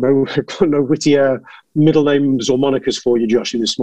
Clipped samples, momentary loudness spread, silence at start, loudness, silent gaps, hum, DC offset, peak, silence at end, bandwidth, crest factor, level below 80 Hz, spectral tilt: under 0.1%; 5 LU; 0 s; -15 LUFS; none; none; 0.6%; 0 dBFS; 0 s; 9.2 kHz; 14 dB; -50 dBFS; -5.5 dB/octave